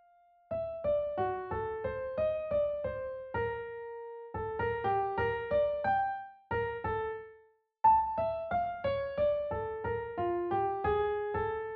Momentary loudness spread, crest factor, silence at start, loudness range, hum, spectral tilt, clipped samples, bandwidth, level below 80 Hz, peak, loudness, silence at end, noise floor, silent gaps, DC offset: 10 LU; 18 dB; 0.5 s; 3 LU; none; -5 dB/octave; under 0.1%; 4.8 kHz; -54 dBFS; -16 dBFS; -33 LUFS; 0 s; -64 dBFS; none; under 0.1%